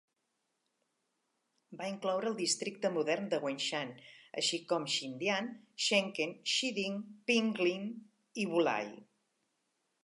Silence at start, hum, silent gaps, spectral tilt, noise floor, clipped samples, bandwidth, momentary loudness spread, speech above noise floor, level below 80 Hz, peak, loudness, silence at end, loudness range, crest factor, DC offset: 1.7 s; none; none; -3 dB/octave; -83 dBFS; under 0.1%; 11.5 kHz; 13 LU; 48 dB; -90 dBFS; -16 dBFS; -34 LUFS; 1 s; 3 LU; 20 dB; under 0.1%